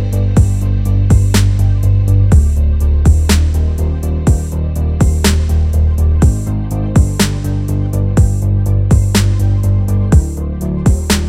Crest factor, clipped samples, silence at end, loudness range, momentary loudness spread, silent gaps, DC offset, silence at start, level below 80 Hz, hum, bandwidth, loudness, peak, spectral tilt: 10 dB; under 0.1%; 0 s; 2 LU; 6 LU; none; under 0.1%; 0 s; -14 dBFS; none; 15.5 kHz; -13 LUFS; 0 dBFS; -6 dB/octave